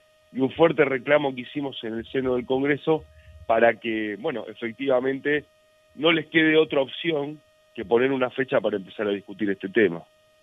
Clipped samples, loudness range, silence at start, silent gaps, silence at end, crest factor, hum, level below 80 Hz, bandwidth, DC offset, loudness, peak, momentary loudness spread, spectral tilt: under 0.1%; 2 LU; 0.35 s; none; 0.4 s; 20 dB; none; -60 dBFS; 6 kHz; under 0.1%; -24 LUFS; -4 dBFS; 11 LU; -7.5 dB/octave